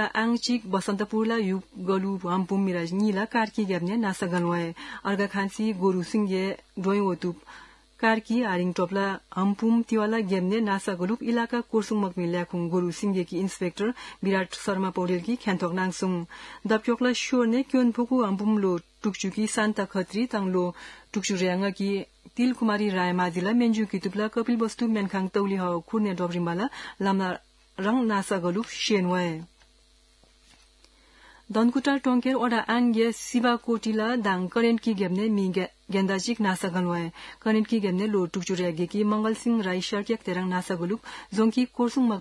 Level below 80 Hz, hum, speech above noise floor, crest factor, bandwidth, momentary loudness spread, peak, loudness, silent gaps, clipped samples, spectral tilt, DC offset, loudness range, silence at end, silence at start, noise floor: -64 dBFS; none; 34 dB; 18 dB; 12 kHz; 6 LU; -8 dBFS; -26 LUFS; none; under 0.1%; -5.5 dB/octave; under 0.1%; 3 LU; 0 s; 0 s; -60 dBFS